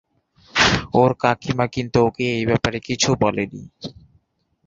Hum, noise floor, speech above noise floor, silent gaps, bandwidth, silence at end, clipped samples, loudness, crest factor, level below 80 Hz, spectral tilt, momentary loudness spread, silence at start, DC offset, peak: none; -65 dBFS; 45 dB; none; 7.8 kHz; 0.75 s; under 0.1%; -19 LUFS; 20 dB; -44 dBFS; -4.5 dB/octave; 15 LU; 0.55 s; under 0.1%; -2 dBFS